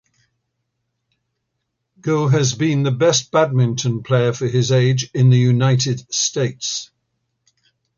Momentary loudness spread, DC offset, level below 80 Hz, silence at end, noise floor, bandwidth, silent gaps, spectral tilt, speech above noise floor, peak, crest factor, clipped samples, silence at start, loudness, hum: 7 LU; under 0.1%; -58 dBFS; 1.15 s; -75 dBFS; 7.4 kHz; none; -5 dB/octave; 59 dB; -4 dBFS; 16 dB; under 0.1%; 2.05 s; -17 LUFS; none